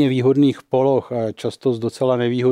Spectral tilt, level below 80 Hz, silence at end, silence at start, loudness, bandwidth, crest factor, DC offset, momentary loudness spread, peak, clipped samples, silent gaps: -7.5 dB/octave; -66 dBFS; 0 s; 0 s; -19 LUFS; 11.5 kHz; 12 dB; under 0.1%; 7 LU; -6 dBFS; under 0.1%; none